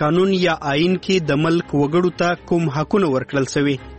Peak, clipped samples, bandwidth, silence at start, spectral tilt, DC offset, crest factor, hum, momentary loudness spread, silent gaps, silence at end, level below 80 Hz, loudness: -4 dBFS; under 0.1%; 8.6 kHz; 0 s; -6 dB/octave; 0.2%; 14 dB; none; 3 LU; none; 0 s; -46 dBFS; -19 LUFS